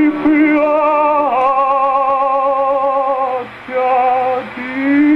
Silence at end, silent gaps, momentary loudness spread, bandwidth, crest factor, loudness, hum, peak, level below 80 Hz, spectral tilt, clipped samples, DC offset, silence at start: 0 s; none; 7 LU; 5.4 kHz; 10 dB; -14 LUFS; none; -2 dBFS; -52 dBFS; -7 dB/octave; under 0.1%; under 0.1%; 0 s